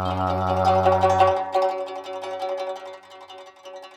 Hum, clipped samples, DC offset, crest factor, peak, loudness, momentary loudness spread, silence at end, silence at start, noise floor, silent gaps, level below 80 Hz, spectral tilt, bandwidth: none; under 0.1%; under 0.1%; 20 dB; -4 dBFS; -22 LUFS; 23 LU; 0 s; 0 s; -43 dBFS; none; -64 dBFS; -6 dB/octave; 12.5 kHz